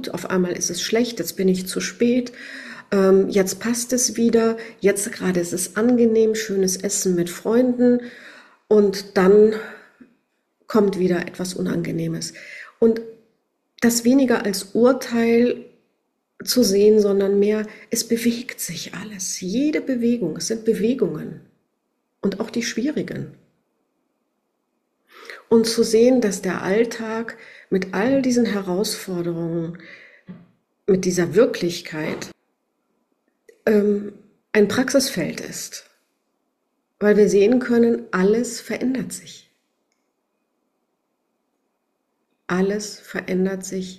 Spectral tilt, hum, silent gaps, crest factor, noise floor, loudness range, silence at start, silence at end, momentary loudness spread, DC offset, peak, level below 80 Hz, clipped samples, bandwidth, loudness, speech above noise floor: -4.5 dB/octave; none; none; 18 dB; -73 dBFS; 7 LU; 0 s; 0 s; 14 LU; under 0.1%; -4 dBFS; -58 dBFS; under 0.1%; 14 kHz; -20 LUFS; 54 dB